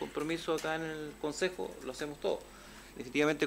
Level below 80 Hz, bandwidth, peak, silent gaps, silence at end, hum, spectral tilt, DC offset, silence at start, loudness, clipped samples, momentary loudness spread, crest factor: -60 dBFS; 16 kHz; -18 dBFS; none; 0 s; none; -4 dB/octave; under 0.1%; 0 s; -36 LUFS; under 0.1%; 14 LU; 18 dB